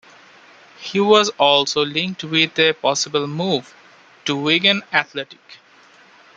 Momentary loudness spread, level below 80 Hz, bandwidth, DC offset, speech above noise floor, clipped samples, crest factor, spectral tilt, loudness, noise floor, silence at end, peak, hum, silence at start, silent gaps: 12 LU; -66 dBFS; 9.2 kHz; under 0.1%; 31 dB; under 0.1%; 20 dB; -3 dB/octave; -17 LUFS; -49 dBFS; 0.8 s; 0 dBFS; none; 0.8 s; none